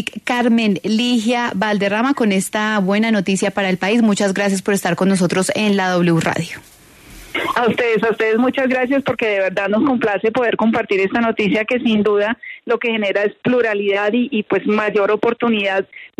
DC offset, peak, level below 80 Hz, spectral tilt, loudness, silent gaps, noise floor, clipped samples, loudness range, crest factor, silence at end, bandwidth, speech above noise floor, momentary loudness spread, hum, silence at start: under 0.1%; -4 dBFS; -56 dBFS; -5 dB/octave; -17 LUFS; none; -41 dBFS; under 0.1%; 1 LU; 14 dB; 0.1 s; 13.5 kHz; 25 dB; 3 LU; none; 0 s